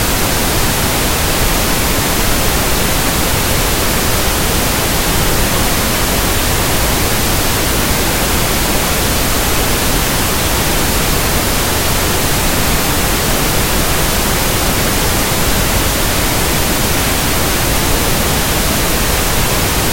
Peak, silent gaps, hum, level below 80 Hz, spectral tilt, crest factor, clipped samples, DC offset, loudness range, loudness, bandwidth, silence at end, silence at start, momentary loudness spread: 0 dBFS; none; none; -20 dBFS; -3 dB/octave; 12 dB; under 0.1%; under 0.1%; 0 LU; -13 LUFS; 16.5 kHz; 0 s; 0 s; 0 LU